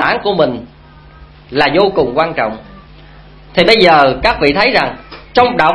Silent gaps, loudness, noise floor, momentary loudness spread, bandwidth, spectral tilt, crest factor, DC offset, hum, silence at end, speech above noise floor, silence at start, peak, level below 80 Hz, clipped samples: none; -12 LUFS; -38 dBFS; 12 LU; 11 kHz; -5.5 dB/octave; 12 dB; under 0.1%; none; 0 s; 27 dB; 0 s; 0 dBFS; -36 dBFS; 0.3%